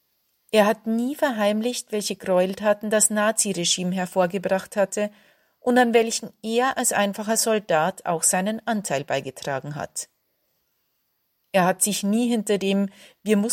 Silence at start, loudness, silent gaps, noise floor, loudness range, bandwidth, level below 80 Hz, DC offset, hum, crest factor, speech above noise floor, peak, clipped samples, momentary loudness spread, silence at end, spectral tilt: 0.55 s; -23 LUFS; none; -72 dBFS; 5 LU; 16.5 kHz; -70 dBFS; under 0.1%; none; 18 dB; 50 dB; -4 dBFS; under 0.1%; 10 LU; 0 s; -3.5 dB/octave